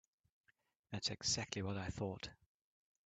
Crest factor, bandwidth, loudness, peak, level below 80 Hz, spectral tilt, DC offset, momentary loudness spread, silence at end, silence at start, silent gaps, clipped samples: 24 dB; 9 kHz; -42 LUFS; -22 dBFS; -68 dBFS; -3 dB/octave; under 0.1%; 12 LU; 0.7 s; 0.9 s; none; under 0.1%